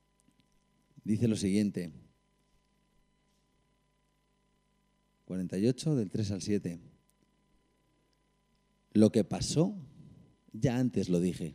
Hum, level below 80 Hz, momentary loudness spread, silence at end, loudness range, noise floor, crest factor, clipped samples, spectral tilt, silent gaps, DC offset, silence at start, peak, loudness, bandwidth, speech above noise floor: 50 Hz at -60 dBFS; -62 dBFS; 15 LU; 0 s; 8 LU; -74 dBFS; 24 dB; under 0.1%; -6.5 dB/octave; none; under 0.1%; 1.05 s; -10 dBFS; -31 LUFS; 15 kHz; 44 dB